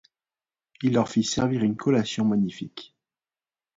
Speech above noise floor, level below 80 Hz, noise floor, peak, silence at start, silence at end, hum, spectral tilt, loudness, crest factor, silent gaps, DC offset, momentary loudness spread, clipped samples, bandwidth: over 66 dB; -60 dBFS; under -90 dBFS; -8 dBFS; 0.8 s; 0.9 s; none; -5.5 dB/octave; -24 LUFS; 18 dB; none; under 0.1%; 13 LU; under 0.1%; 7.8 kHz